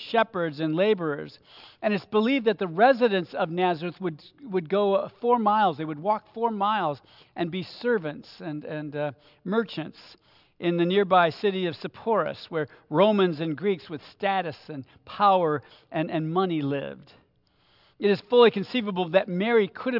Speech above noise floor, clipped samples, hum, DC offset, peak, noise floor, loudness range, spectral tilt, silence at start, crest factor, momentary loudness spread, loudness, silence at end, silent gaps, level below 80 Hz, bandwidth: 40 dB; under 0.1%; none; under 0.1%; -6 dBFS; -65 dBFS; 5 LU; -8 dB/octave; 0 s; 20 dB; 14 LU; -25 LUFS; 0 s; none; -74 dBFS; 5.8 kHz